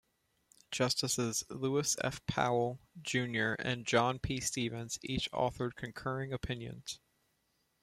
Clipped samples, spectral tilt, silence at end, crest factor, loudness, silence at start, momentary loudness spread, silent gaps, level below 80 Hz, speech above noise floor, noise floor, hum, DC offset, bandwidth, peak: under 0.1%; -3.5 dB/octave; 0.85 s; 22 dB; -35 LUFS; 0.7 s; 10 LU; none; -58 dBFS; 43 dB; -78 dBFS; none; under 0.1%; 16 kHz; -14 dBFS